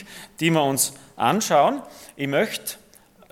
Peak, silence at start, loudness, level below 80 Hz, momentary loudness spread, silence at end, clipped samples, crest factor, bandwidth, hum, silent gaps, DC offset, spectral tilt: -4 dBFS; 0 s; -22 LUFS; -66 dBFS; 17 LU; 0.55 s; under 0.1%; 20 dB; 17.5 kHz; none; none; under 0.1%; -3.5 dB/octave